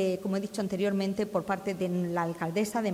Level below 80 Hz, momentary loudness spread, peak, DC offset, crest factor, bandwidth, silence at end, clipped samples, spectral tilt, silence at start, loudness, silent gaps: -66 dBFS; 3 LU; -16 dBFS; under 0.1%; 14 dB; 16 kHz; 0 s; under 0.1%; -6 dB/octave; 0 s; -31 LUFS; none